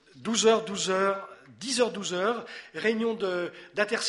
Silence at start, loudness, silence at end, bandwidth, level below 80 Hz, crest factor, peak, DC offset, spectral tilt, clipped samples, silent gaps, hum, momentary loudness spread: 0.15 s; -28 LUFS; 0 s; 11.5 kHz; -74 dBFS; 20 dB; -8 dBFS; under 0.1%; -3 dB/octave; under 0.1%; none; none; 12 LU